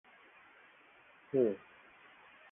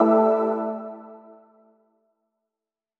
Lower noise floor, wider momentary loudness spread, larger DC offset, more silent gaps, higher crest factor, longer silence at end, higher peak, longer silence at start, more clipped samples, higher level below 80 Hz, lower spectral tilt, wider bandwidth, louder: second, -63 dBFS vs -90 dBFS; first, 27 LU vs 24 LU; neither; neither; about the same, 22 dB vs 20 dB; second, 0.95 s vs 1.85 s; second, -18 dBFS vs -6 dBFS; first, 1.35 s vs 0 s; neither; first, -82 dBFS vs under -90 dBFS; second, -5.5 dB/octave vs -9.5 dB/octave; second, 3.7 kHz vs 4.2 kHz; second, -35 LUFS vs -22 LUFS